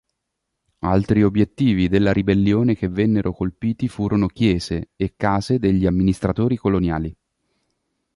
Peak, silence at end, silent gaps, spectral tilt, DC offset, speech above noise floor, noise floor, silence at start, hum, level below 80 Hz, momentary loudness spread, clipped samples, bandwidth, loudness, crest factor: -4 dBFS; 1.05 s; none; -8 dB/octave; under 0.1%; 60 dB; -78 dBFS; 0.85 s; none; -38 dBFS; 7 LU; under 0.1%; 11.5 kHz; -20 LUFS; 16 dB